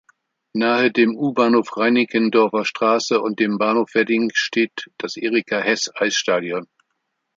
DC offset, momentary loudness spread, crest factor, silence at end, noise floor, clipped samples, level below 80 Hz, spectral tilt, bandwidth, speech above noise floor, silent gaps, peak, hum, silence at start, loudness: under 0.1%; 7 LU; 18 dB; 0.7 s; -74 dBFS; under 0.1%; -70 dBFS; -4 dB/octave; 7.6 kHz; 56 dB; none; -2 dBFS; none; 0.55 s; -19 LUFS